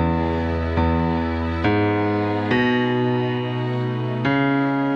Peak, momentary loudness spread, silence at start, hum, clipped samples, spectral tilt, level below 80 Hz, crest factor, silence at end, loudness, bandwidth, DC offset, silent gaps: -8 dBFS; 5 LU; 0 s; none; under 0.1%; -8.5 dB/octave; -40 dBFS; 14 dB; 0 s; -21 LUFS; 6.8 kHz; under 0.1%; none